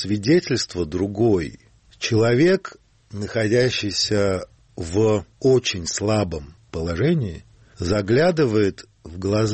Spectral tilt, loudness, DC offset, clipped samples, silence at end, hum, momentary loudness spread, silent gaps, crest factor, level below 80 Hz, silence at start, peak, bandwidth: -5.5 dB/octave; -21 LUFS; under 0.1%; under 0.1%; 0 s; none; 16 LU; none; 14 dB; -46 dBFS; 0 s; -8 dBFS; 8.8 kHz